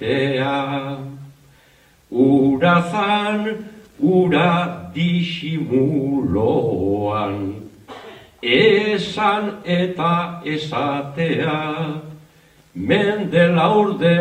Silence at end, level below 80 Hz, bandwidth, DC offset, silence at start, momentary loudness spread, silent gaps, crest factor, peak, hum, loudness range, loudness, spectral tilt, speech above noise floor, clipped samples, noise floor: 0 s; -56 dBFS; 9.4 kHz; under 0.1%; 0 s; 14 LU; none; 18 dB; -2 dBFS; none; 4 LU; -19 LUFS; -7 dB/octave; 35 dB; under 0.1%; -53 dBFS